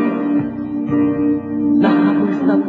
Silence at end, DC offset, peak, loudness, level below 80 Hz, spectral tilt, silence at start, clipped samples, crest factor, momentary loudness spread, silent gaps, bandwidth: 0 s; under 0.1%; -2 dBFS; -16 LUFS; -50 dBFS; -9.5 dB/octave; 0 s; under 0.1%; 12 dB; 6 LU; none; 4.5 kHz